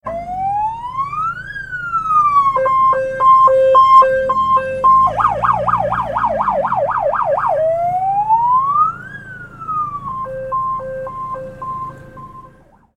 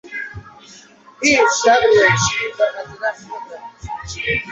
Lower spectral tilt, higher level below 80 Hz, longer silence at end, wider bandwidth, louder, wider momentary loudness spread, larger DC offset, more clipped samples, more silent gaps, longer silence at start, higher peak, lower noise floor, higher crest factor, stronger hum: first, -6 dB/octave vs -3 dB/octave; about the same, -44 dBFS vs -46 dBFS; first, 0.5 s vs 0 s; first, 9.6 kHz vs 8.4 kHz; about the same, -15 LUFS vs -16 LUFS; second, 17 LU vs 20 LU; neither; neither; neither; about the same, 0.05 s vs 0.05 s; about the same, 0 dBFS vs -2 dBFS; about the same, -47 dBFS vs -44 dBFS; about the same, 14 dB vs 18 dB; neither